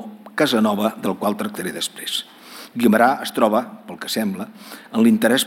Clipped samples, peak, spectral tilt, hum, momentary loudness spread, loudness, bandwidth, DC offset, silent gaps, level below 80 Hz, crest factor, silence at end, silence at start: under 0.1%; -2 dBFS; -4 dB/octave; none; 17 LU; -20 LUFS; 17 kHz; under 0.1%; none; -68 dBFS; 18 dB; 0 s; 0 s